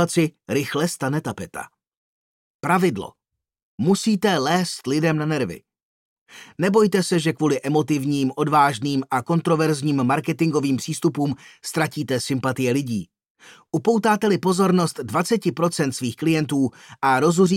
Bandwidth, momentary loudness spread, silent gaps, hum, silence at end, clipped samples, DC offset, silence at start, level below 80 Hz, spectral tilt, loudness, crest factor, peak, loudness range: 16.5 kHz; 10 LU; 1.97-2.59 s, 3.63-3.78 s, 5.83-6.26 s, 13.30-13.35 s; none; 0 s; under 0.1%; under 0.1%; 0 s; -64 dBFS; -5.5 dB/octave; -21 LUFS; 16 dB; -6 dBFS; 4 LU